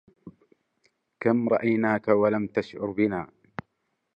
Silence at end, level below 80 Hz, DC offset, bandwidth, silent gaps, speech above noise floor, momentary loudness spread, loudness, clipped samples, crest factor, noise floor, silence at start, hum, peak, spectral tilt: 0.9 s; -64 dBFS; under 0.1%; 6.8 kHz; none; 53 dB; 18 LU; -25 LUFS; under 0.1%; 20 dB; -77 dBFS; 0.25 s; none; -8 dBFS; -9 dB/octave